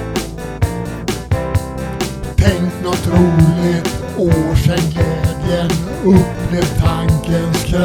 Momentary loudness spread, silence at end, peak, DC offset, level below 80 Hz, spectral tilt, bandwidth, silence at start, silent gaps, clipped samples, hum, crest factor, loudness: 10 LU; 0 s; 0 dBFS; under 0.1%; -26 dBFS; -6.5 dB/octave; 19 kHz; 0 s; none; under 0.1%; none; 14 dB; -16 LUFS